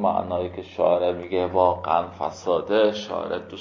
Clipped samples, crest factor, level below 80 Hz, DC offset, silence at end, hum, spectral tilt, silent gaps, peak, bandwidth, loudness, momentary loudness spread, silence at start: under 0.1%; 18 dB; -50 dBFS; under 0.1%; 0 s; none; -6 dB/octave; none; -4 dBFS; 7.4 kHz; -24 LUFS; 9 LU; 0 s